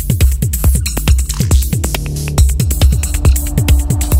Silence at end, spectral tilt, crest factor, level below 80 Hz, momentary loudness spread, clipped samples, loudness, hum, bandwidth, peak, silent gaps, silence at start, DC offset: 0 s; -5 dB/octave; 12 dB; -14 dBFS; 4 LU; under 0.1%; -14 LUFS; none; 16.5 kHz; 0 dBFS; none; 0 s; under 0.1%